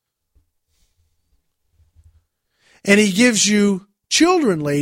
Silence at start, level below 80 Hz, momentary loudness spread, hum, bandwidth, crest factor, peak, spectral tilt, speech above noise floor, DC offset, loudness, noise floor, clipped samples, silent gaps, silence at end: 2.85 s; -58 dBFS; 7 LU; none; 16.5 kHz; 18 dB; -2 dBFS; -3.5 dB/octave; 51 dB; under 0.1%; -16 LUFS; -66 dBFS; under 0.1%; none; 0 s